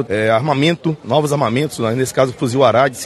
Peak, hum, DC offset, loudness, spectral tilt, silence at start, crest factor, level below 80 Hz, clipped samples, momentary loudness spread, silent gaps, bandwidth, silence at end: 0 dBFS; none; under 0.1%; -16 LUFS; -5.5 dB/octave; 0 s; 16 dB; -52 dBFS; under 0.1%; 5 LU; none; 12.5 kHz; 0 s